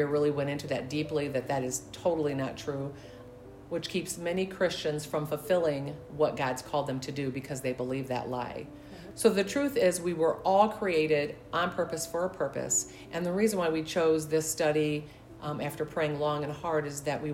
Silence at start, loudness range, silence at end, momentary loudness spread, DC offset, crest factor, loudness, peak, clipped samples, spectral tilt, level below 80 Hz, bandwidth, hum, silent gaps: 0 s; 5 LU; 0 s; 11 LU; under 0.1%; 20 dB; -30 LUFS; -10 dBFS; under 0.1%; -4.5 dB/octave; -60 dBFS; 16 kHz; none; none